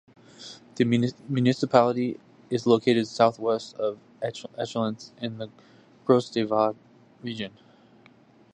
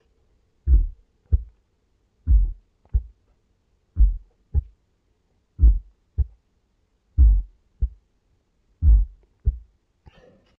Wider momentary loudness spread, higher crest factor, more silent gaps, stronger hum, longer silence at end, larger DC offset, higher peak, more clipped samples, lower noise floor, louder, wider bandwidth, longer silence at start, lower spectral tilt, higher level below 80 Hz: first, 19 LU vs 15 LU; first, 24 dB vs 18 dB; neither; neither; about the same, 1.05 s vs 1 s; neither; first, -2 dBFS vs -6 dBFS; neither; second, -56 dBFS vs -67 dBFS; about the same, -26 LUFS vs -25 LUFS; first, 9.6 kHz vs 0.9 kHz; second, 0.4 s vs 0.65 s; second, -6.5 dB/octave vs -12 dB/octave; second, -70 dBFS vs -24 dBFS